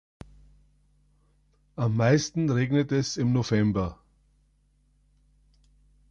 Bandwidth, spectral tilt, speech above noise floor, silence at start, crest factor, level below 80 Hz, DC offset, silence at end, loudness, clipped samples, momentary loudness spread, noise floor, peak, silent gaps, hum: 7.8 kHz; -6.5 dB/octave; 41 dB; 1.8 s; 18 dB; -52 dBFS; under 0.1%; 2.15 s; -25 LUFS; under 0.1%; 8 LU; -66 dBFS; -10 dBFS; none; 50 Hz at -50 dBFS